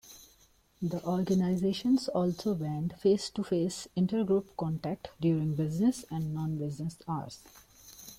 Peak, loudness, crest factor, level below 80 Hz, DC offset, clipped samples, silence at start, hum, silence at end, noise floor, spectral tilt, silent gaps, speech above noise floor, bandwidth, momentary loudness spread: -16 dBFS; -31 LUFS; 16 dB; -62 dBFS; under 0.1%; under 0.1%; 0.05 s; none; 0.05 s; -64 dBFS; -7 dB/octave; none; 34 dB; 16 kHz; 10 LU